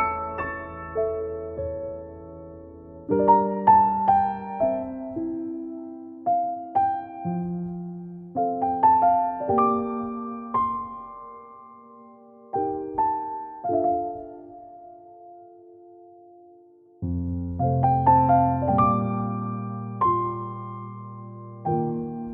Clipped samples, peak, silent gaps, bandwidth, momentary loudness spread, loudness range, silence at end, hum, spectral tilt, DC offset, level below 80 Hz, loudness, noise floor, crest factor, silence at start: under 0.1%; -6 dBFS; none; 3.8 kHz; 21 LU; 9 LU; 0 s; none; -12.5 dB/octave; under 0.1%; -50 dBFS; -24 LUFS; -53 dBFS; 20 dB; 0 s